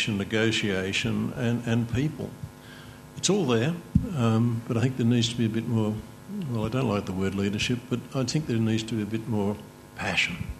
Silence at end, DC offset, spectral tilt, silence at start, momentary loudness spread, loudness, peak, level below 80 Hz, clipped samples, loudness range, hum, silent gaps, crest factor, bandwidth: 0 s; under 0.1%; -5.5 dB/octave; 0 s; 13 LU; -27 LUFS; -8 dBFS; -48 dBFS; under 0.1%; 3 LU; none; none; 20 dB; 13.5 kHz